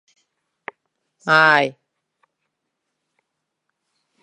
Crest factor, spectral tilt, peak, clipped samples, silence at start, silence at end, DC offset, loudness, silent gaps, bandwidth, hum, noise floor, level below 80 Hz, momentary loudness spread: 24 dB; -4.5 dB/octave; 0 dBFS; under 0.1%; 1.25 s; 2.5 s; under 0.1%; -15 LUFS; none; 11 kHz; none; -78 dBFS; -78 dBFS; 25 LU